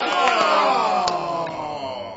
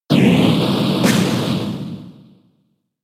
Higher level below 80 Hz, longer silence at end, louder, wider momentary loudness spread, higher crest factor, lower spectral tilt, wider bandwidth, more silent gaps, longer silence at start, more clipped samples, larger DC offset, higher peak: second, -58 dBFS vs -52 dBFS; second, 0 s vs 0.95 s; second, -20 LUFS vs -16 LUFS; second, 12 LU vs 15 LU; about the same, 18 dB vs 16 dB; second, -3 dB/octave vs -6 dB/octave; second, 8 kHz vs 16 kHz; neither; about the same, 0 s vs 0.1 s; neither; neither; about the same, -4 dBFS vs -2 dBFS